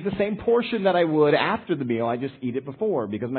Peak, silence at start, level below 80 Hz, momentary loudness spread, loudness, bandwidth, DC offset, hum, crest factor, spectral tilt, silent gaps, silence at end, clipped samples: -6 dBFS; 0 s; -56 dBFS; 9 LU; -23 LUFS; 4.5 kHz; under 0.1%; none; 16 dB; -11 dB/octave; none; 0 s; under 0.1%